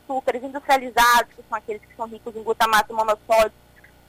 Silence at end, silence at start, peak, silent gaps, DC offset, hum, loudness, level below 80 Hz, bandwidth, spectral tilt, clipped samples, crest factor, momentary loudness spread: 0.6 s; 0.1 s; -6 dBFS; none; under 0.1%; none; -20 LUFS; -50 dBFS; 16 kHz; -1.5 dB/octave; under 0.1%; 16 dB; 16 LU